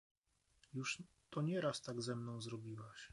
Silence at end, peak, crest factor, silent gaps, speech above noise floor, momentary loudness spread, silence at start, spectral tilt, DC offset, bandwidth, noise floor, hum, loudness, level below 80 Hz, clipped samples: 0.05 s; -28 dBFS; 18 dB; none; 32 dB; 12 LU; 0.75 s; -5 dB/octave; under 0.1%; 11.5 kHz; -76 dBFS; none; -45 LUFS; -80 dBFS; under 0.1%